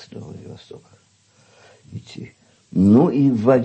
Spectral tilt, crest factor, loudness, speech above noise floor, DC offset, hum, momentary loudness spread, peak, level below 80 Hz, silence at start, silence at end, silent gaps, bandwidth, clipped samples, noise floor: -9 dB/octave; 16 dB; -16 LUFS; 37 dB; under 0.1%; none; 25 LU; -4 dBFS; -58 dBFS; 0.15 s; 0 s; none; 8.6 kHz; under 0.1%; -55 dBFS